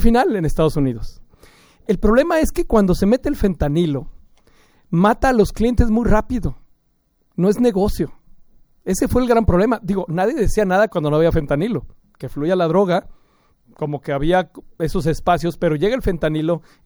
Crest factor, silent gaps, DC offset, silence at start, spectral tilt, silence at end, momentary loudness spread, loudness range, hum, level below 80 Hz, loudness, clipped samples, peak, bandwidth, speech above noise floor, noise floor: 18 dB; none; under 0.1%; 0 s; -7 dB/octave; 0.3 s; 11 LU; 3 LU; none; -28 dBFS; -18 LUFS; under 0.1%; 0 dBFS; over 20 kHz; 46 dB; -63 dBFS